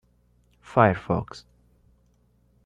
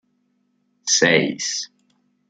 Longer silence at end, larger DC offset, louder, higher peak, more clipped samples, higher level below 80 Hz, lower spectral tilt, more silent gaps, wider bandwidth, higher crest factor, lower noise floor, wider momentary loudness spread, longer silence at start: first, 1.25 s vs 0.65 s; neither; second, -23 LUFS vs -19 LUFS; about the same, -4 dBFS vs -2 dBFS; neither; first, -54 dBFS vs -66 dBFS; first, -8 dB/octave vs -2 dB/octave; neither; about the same, 9.6 kHz vs 10.5 kHz; about the same, 24 dB vs 22 dB; second, -63 dBFS vs -67 dBFS; first, 21 LU vs 15 LU; second, 0.7 s vs 0.85 s